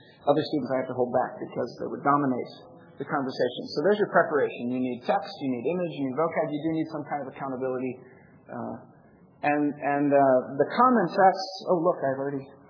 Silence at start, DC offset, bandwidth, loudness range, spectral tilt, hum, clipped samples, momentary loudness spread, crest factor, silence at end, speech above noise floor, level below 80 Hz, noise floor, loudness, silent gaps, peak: 0.25 s; under 0.1%; 5.4 kHz; 8 LU; -7 dB/octave; none; under 0.1%; 12 LU; 20 dB; 0.2 s; 29 dB; -76 dBFS; -55 dBFS; -26 LUFS; none; -6 dBFS